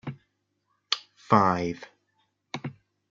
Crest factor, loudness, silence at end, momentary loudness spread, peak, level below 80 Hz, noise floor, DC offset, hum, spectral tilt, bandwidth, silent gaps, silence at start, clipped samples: 26 dB; -27 LUFS; 0.4 s; 19 LU; -4 dBFS; -68 dBFS; -75 dBFS; under 0.1%; 50 Hz at -55 dBFS; -5.5 dB/octave; 7.6 kHz; none; 0.05 s; under 0.1%